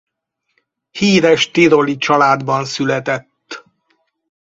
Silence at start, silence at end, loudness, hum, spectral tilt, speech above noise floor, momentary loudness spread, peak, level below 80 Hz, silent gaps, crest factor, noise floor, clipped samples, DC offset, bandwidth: 0.95 s; 0.8 s; -14 LUFS; none; -5 dB/octave; 59 dB; 22 LU; 0 dBFS; -56 dBFS; none; 16 dB; -73 dBFS; under 0.1%; under 0.1%; 8 kHz